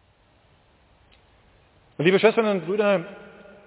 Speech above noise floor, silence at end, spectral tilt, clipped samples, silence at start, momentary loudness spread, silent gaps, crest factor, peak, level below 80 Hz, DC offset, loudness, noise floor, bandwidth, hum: 39 dB; 0.4 s; -10 dB/octave; under 0.1%; 2 s; 16 LU; none; 20 dB; -4 dBFS; -66 dBFS; under 0.1%; -21 LUFS; -60 dBFS; 4 kHz; none